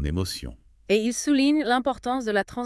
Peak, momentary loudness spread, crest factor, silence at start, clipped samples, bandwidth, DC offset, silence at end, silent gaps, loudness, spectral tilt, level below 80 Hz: -10 dBFS; 10 LU; 14 dB; 0 s; under 0.1%; 12 kHz; under 0.1%; 0 s; none; -24 LUFS; -4.5 dB/octave; -42 dBFS